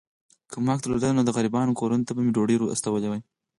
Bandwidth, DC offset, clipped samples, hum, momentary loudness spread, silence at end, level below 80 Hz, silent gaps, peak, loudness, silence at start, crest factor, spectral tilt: 11.5 kHz; under 0.1%; under 0.1%; none; 7 LU; 0.4 s; -58 dBFS; none; -10 dBFS; -25 LUFS; 0.5 s; 14 dB; -6 dB/octave